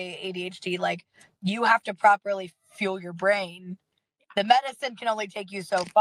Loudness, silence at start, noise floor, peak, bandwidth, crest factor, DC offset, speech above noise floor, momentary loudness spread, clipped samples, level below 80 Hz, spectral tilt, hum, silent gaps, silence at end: -26 LUFS; 0 s; -59 dBFS; -4 dBFS; 13 kHz; 22 dB; under 0.1%; 33 dB; 15 LU; under 0.1%; -78 dBFS; -4.5 dB/octave; none; none; 0 s